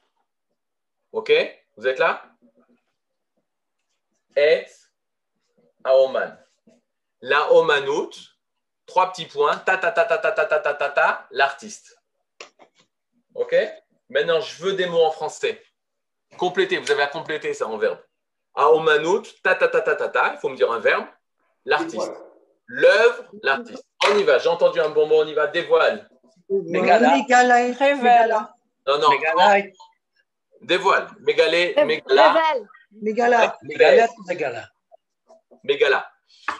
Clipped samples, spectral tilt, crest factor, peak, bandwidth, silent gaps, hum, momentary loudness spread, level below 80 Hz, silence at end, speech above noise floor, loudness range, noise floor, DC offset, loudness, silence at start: under 0.1%; -3.5 dB/octave; 20 dB; 0 dBFS; 10.5 kHz; none; none; 15 LU; -80 dBFS; 0 s; 65 dB; 8 LU; -84 dBFS; under 0.1%; -19 LUFS; 1.15 s